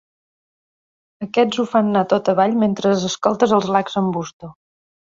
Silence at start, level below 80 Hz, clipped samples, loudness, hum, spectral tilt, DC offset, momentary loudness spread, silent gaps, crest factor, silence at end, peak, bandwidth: 1.2 s; -60 dBFS; under 0.1%; -18 LUFS; none; -5.5 dB/octave; under 0.1%; 7 LU; 4.33-4.40 s; 18 dB; 0.6 s; -2 dBFS; 7.8 kHz